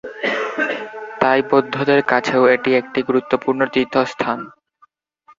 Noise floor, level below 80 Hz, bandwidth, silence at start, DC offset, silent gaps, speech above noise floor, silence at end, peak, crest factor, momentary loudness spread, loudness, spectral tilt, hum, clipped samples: -57 dBFS; -60 dBFS; 7.6 kHz; 0.05 s; under 0.1%; none; 39 dB; 0.9 s; 0 dBFS; 18 dB; 8 LU; -18 LUFS; -5.5 dB/octave; none; under 0.1%